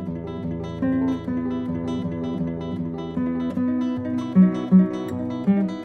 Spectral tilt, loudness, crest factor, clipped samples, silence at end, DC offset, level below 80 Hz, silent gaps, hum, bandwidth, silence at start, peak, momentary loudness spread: -9.5 dB/octave; -23 LUFS; 16 dB; under 0.1%; 0 s; under 0.1%; -50 dBFS; none; none; 6.4 kHz; 0 s; -6 dBFS; 11 LU